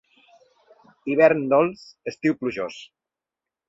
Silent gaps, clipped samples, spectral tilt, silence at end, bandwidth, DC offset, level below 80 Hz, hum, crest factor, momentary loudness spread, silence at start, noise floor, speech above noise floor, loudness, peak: none; under 0.1%; -7 dB/octave; 0.85 s; 7.8 kHz; under 0.1%; -66 dBFS; none; 20 dB; 17 LU; 1.05 s; -88 dBFS; 67 dB; -22 LUFS; -4 dBFS